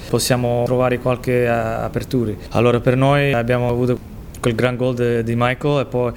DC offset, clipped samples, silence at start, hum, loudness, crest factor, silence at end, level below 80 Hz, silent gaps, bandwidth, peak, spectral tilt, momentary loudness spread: under 0.1%; under 0.1%; 0 s; none; -18 LUFS; 16 dB; 0 s; -38 dBFS; none; 17 kHz; -2 dBFS; -6 dB/octave; 6 LU